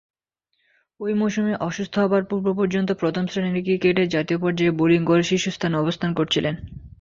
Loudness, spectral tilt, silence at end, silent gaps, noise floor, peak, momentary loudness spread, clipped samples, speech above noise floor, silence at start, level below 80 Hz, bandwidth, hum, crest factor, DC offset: -22 LUFS; -6 dB/octave; 0.15 s; none; -74 dBFS; -6 dBFS; 6 LU; under 0.1%; 53 dB; 1 s; -52 dBFS; 7.6 kHz; none; 16 dB; under 0.1%